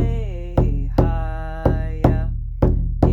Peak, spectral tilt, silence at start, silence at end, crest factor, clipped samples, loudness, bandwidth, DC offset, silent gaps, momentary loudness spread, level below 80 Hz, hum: -2 dBFS; -10 dB/octave; 0 s; 0 s; 18 dB; under 0.1%; -21 LUFS; 5.6 kHz; under 0.1%; none; 7 LU; -22 dBFS; none